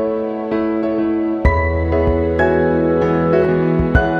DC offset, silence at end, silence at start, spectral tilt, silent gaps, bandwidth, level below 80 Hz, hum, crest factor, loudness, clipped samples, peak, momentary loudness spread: under 0.1%; 0 s; 0 s; -9.5 dB/octave; none; 6.4 kHz; -26 dBFS; none; 14 dB; -16 LUFS; under 0.1%; -2 dBFS; 4 LU